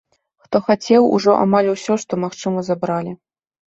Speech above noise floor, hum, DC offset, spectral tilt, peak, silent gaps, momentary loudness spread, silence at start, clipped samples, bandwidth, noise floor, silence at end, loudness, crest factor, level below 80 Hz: 21 dB; none; under 0.1%; -6 dB/octave; -2 dBFS; none; 9 LU; 0.5 s; under 0.1%; 8 kHz; -38 dBFS; 0.55 s; -17 LUFS; 16 dB; -60 dBFS